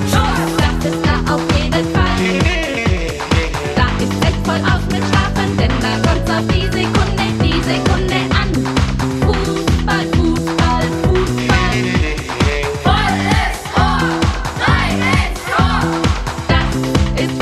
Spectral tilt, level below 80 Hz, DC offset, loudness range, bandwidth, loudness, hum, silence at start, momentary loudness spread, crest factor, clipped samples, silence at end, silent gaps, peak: -5.5 dB/octave; -22 dBFS; under 0.1%; 1 LU; 14 kHz; -15 LUFS; none; 0 s; 3 LU; 14 dB; under 0.1%; 0 s; none; 0 dBFS